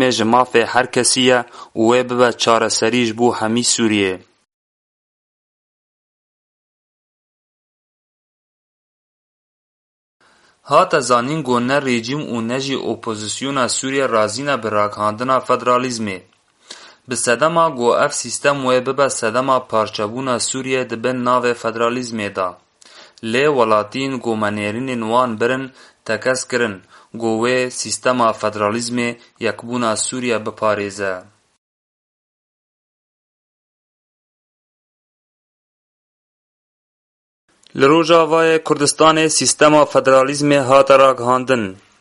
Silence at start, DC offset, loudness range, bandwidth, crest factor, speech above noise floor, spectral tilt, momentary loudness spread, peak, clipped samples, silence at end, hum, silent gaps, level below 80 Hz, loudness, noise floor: 0 s; under 0.1%; 9 LU; 11.5 kHz; 18 dB; 28 dB; -3.5 dB/octave; 11 LU; 0 dBFS; under 0.1%; 0.25 s; none; 4.54-10.20 s, 31.58-37.48 s; -60 dBFS; -16 LUFS; -45 dBFS